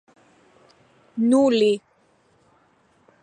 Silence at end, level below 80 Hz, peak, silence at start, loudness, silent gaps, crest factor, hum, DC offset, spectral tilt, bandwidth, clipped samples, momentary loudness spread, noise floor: 1.45 s; -74 dBFS; -8 dBFS; 1.15 s; -20 LUFS; none; 16 dB; none; under 0.1%; -5 dB/octave; 10.5 kHz; under 0.1%; 12 LU; -61 dBFS